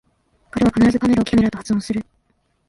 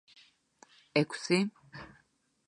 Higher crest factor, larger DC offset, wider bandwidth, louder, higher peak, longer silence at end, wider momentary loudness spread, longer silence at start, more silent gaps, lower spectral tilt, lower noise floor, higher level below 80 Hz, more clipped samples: second, 14 dB vs 24 dB; neither; about the same, 11.5 kHz vs 10.5 kHz; first, -18 LUFS vs -31 LUFS; first, -4 dBFS vs -12 dBFS; about the same, 0.65 s vs 0.6 s; second, 11 LU vs 20 LU; second, 0.55 s vs 0.95 s; neither; first, -6.5 dB/octave vs -5 dB/octave; second, -65 dBFS vs -72 dBFS; first, -42 dBFS vs -72 dBFS; neither